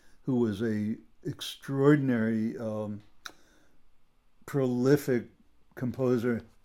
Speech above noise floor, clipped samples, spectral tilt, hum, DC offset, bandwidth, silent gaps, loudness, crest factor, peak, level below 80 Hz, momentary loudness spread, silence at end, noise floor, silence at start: 30 dB; under 0.1%; -7 dB/octave; none; under 0.1%; 17 kHz; none; -29 LUFS; 20 dB; -10 dBFS; -66 dBFS; 16 LU; 0.2 s; -58 dBFS; 0.15 s